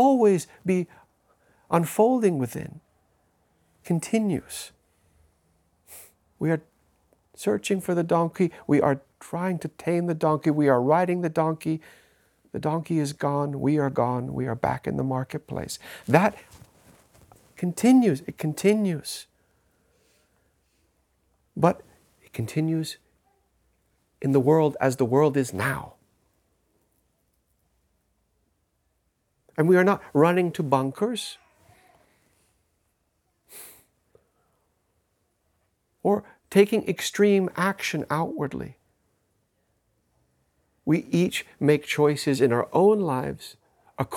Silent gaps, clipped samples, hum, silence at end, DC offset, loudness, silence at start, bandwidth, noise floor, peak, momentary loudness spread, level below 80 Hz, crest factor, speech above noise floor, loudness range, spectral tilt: none; under 0.1%; none; 0 s; under 0.1%; -24 LUFS; 0 s; 18 kHz; -73 dBFS; -2 dBFS; 15 LU; -64 dBFS; 24 dB; 49 dB; 8 LU; -6.5 dB/octave